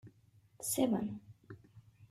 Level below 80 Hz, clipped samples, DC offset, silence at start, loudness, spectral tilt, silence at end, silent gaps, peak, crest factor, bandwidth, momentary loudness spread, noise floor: -72 dBFS; under 0.1%; under 0.1%; 0.05 s; -36 LUFS; -4.5 dB/octave; 0.05 s; none; -20 dBFS; 20 dB; 15.5 kHz; 23 LU; -67 dBFS